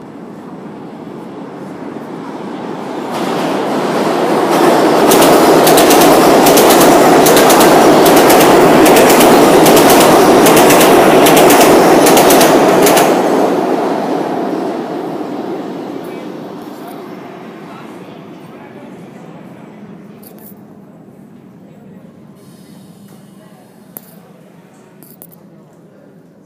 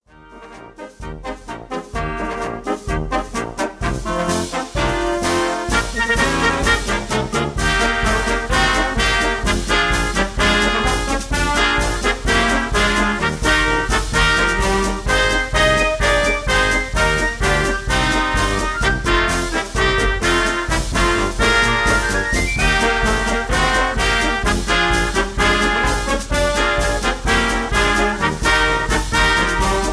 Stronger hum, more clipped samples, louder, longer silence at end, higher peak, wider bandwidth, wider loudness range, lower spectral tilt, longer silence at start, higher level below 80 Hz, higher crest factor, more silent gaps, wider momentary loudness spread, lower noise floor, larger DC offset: neither; first, 0.8% vs under 0.1%; first, -7 LUFS vs -17 LUFS; first, 5.95 s vs 0 s; first, 0 dBFS vs -4 dBFS; first, over 20 kHz vs 11 kHz; first, 19 LU vs 5 LU; about the same, -3.5 dB/octave vs -3.5 dB/octave; second, 0 s vs 0.25 s; second, -44 dBFS vs -24 dBFS; about the same, 10 dB vs 14 dB; neither; first, 23 LU vs 8 LU; about the same, -41 dBFS vs -41 dBFS; neither